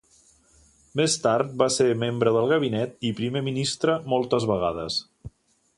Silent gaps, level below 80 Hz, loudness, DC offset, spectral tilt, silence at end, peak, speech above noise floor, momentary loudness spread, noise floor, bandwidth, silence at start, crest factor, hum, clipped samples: none; -56 dBFS; -24 LUFS; under 0.1%; -4.5 dB/octave; 0.5 s; -6 dBFS; 36 dB; 7 LU; -59 dBFS; 11.5 kHz; 0.95 s; 20 dB; none; under 0.1%